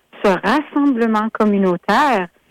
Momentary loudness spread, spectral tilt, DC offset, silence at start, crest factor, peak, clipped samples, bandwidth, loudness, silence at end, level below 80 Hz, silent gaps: 3 LU; -6.5 dB/octave; under 0.1%; 0.15 s; 10 dB; -6 dBFS; under 0.1%; 15.5 kHz; -16 LUFS; 0.25 s; -52 dBFS; none